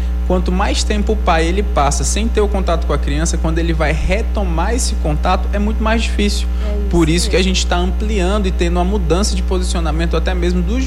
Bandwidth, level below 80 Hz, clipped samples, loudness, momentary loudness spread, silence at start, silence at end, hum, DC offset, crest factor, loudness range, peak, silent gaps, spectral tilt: 12 kHz; -16 dBFS; under 0.1%; -16 LUFS; 3 LU; 0 s; 0 s; 60 Hz at -15 dBFS; under 0.1%; 10 dB; 1 LU; -4 dBFS; none; -5 dB/octave